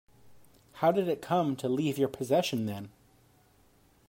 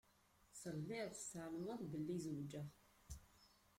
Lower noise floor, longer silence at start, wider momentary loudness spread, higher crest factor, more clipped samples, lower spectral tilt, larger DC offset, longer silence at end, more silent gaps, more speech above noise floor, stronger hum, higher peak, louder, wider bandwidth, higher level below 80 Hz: second, -64 dBFS vs -75 dBFS; second, 0.25 s vs 0.5 s; second, 9 LU vs 14 LU; about the same, 18 dB vs 16 dB; neither; about the same, -6 dB/octave vs -5.5 dB/octave; neither; first, 1.2 s vs 0.3 s; neither; first, 35 dB vs 27 dB; neither; first, -14 dBFS vs -36 dBFS; first, -30 LUFS vs -49 LUFS; about the same, 16 kHz vs 16.5 kHz; about the same, -70 dBFS vs -70 dBFS